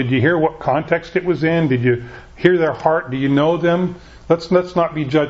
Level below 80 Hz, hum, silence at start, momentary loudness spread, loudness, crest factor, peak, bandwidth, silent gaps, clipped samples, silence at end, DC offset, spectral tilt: -46 dBFS; none; 0 s; 5 LU; -17 LUFS; 16 dB; 0 dBFS; 7.6 kHz; none; under 0.1%; 0 s; under 0.1%; -8 dB/octave